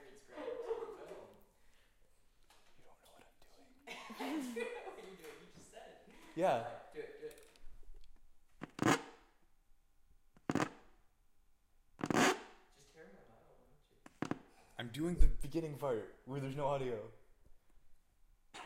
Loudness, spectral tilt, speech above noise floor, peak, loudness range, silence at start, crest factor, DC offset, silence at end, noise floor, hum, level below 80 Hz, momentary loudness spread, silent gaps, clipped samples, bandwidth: -40 LUFS; -5 dB/octave; 34 dB; -14 dBFS; 10 LU; 0 s; 26 dB; under 0.1%; 0 s; -69 dBFS; none; -46 dBFS; 23 LU; none; under 0.1%; 16 kHz